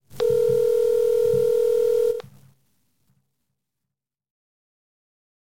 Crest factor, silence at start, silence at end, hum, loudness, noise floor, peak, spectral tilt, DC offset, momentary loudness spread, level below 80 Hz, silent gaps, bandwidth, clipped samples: 12 dB; 0.15 s; 3.3 s; none; -21 LUFS; -85 dBFS; -12 dBFS; -5.5 dB/octave; under 0.1%; 3 LU; -60 dBFS; none; 17 kHz; under 0.1%